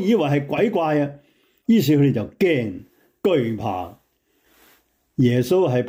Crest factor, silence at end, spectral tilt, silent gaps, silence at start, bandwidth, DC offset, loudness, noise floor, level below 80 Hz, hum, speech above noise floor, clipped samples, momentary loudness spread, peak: 14 dB; 0 s; -7.5 dB/octave; none; 0 s; 16.5 kHz; under 0.1%; -20 LUFS; -65 dBFS; -60 dBFS; none; 46 dB; under 0.1%; 13 LU; -8 dBFS